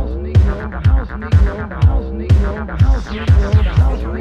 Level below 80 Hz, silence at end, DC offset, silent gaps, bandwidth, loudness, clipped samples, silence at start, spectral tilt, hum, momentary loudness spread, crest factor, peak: -16 dBFS; 0 s; under 0.1%; none; 6.8 kHz; -16 LUFS; under 0.1%; 0 s; -8.5 dB/octave; none; 6 LU; 12 dB; 0 dBFS